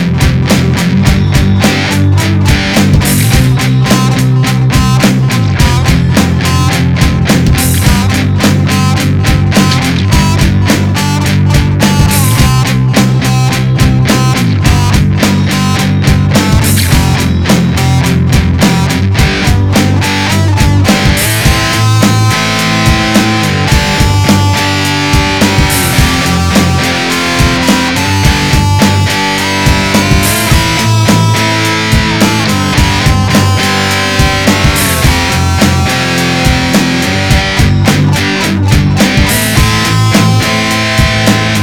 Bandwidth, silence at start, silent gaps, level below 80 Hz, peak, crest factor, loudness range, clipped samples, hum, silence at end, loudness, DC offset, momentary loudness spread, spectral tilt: 19 kHz; 0 s; none; -18 dBFS; 0 dBFS; 8 dB; 1 LU; 0.3%; none; 0 s; -8 LUFS; 1%; 2 LU; -4.5 dB/octave